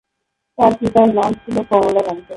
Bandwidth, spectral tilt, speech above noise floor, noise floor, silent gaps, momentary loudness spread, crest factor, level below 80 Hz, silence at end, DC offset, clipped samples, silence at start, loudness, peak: 11.5 kHz; -7 dB/octave; 60 dB; -75 dBFS; none; 6 LU; 16 dB; -48 dBFS; 0 s; under 0.1%; under 0.1%; 0.6 s; -15 LUFS; 0 dBFS